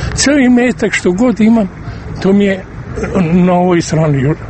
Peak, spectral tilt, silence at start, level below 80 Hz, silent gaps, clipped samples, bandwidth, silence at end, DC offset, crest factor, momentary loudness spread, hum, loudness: 0 dBFS; -6 dB/octave; 0 s; -32 dBFS; none; under 0.1%; 8.8 kHz; 0 s; under 0.1%; 12 dB; 11 LU; none; -11 LUFS